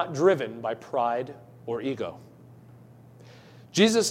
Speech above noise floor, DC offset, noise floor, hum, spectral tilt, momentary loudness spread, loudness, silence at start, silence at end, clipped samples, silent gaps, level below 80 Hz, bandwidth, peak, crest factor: 25 dB; under 0.1%; -51 dBFS; none; -4 dB/octave; 16 LU; -27 LUFS; 0 s; 0 s; under 0.1%; none; -72 dBFS; 16 kHz; -8 dBFS; 20 dB